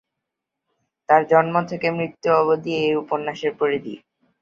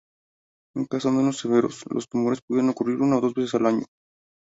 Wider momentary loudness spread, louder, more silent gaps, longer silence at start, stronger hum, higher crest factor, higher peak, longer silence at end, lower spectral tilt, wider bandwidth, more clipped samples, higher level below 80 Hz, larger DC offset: about the same, 9 LU vs 9 LU; first, -20 LUFS vs -24 LUFS; second, none vs 2.42-2.48 s; first, 1.1 s vs 0.75 s; neither; about the same, 20 dB vs 18 dB; first, -2 dBFS vs -6 dBFS; second, 0.45 s vs 0.65 s; about the same, -6.5 dB/octave vs -6.5 dB/octave; second, 7.2 kHz vs 8 kHz; neither; about the same, -66 dBFS vs -66 dBFS; neither